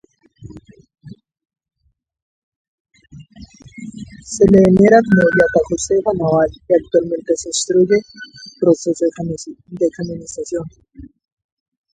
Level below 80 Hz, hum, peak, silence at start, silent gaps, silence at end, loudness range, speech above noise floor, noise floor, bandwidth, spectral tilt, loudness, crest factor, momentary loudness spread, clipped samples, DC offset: -46 dBFS; none; 0 dBFS; 0.4 s; 2.22-2.85 s; 0.95 s; 8 LU; 27 dB; -42 dBFS; 9.4 kHz; -5.5 dB/octave; -15 LUFS; 18 dB; 23 LU; under 0.1%; under 0.1%